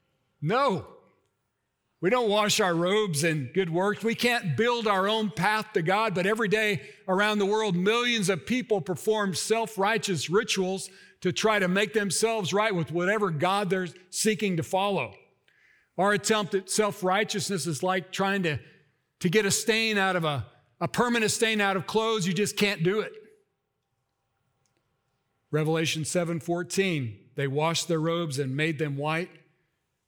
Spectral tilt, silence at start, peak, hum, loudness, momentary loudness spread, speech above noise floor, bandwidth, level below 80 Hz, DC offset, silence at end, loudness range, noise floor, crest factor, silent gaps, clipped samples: -4 dB/octave; 0.4 s; -10 dBFS; none; -26 LUFS; 7 LU; 52 dB; over 20 kHz; -68 dBFS; under 0.1%; 0.8 s; 4 LU; -79 dBFS; 18 dB; none; under 0.1%